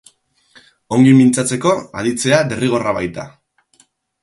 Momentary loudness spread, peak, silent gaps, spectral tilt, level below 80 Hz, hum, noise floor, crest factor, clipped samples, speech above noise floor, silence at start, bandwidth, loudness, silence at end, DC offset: 13 LU; 0 dBFS; none; -5.5 dB/octave; -52 dBFS; none; -56 dBFS; 16 dB; under 0.1%; 42 dB; 0.9 s; 11.5 kHz; -15 LUFS; 0.95 s; under 0.1%